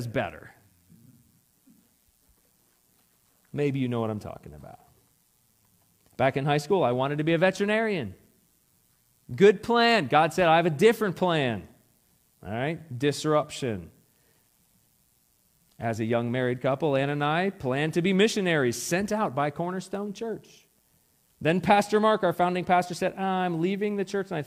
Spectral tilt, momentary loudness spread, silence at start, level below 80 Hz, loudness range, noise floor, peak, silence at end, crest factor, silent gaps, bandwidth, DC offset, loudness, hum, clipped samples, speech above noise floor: -5.5 dB/octave; 14 LU; 0 s; -64 dBFS; 11 LU; -67 dBFS; -6 dBFS; 0 s; 20 dB; none; 16 kHz; under 0.1%; -25 LUFS; none; under 0.1%; 41 dB